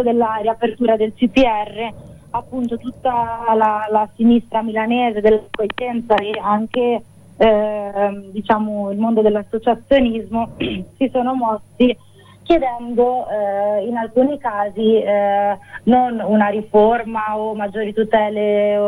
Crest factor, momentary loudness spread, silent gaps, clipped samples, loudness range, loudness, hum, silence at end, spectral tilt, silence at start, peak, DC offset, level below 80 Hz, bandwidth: 14 dB; 8 LU; none; under 0.1%; 2 LU; -18 LUFS; none; 0 s; -7 dB/octave; 0 s; -2 dBFS; under 0.1%; -44 dBFS; 10.5 kHz